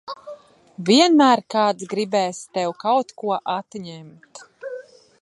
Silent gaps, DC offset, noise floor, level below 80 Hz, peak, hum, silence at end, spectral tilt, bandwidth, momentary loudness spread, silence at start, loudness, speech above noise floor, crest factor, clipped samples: none; under 0.1%; -42 dBFS; -74 dBFS; -2 dBFS; none; 0.4 s; -4 dB/octave; 11.5 kHz; 23 LU; 0.1 s; -20 LUFS; 22 dB; 18 dB; under 0.1%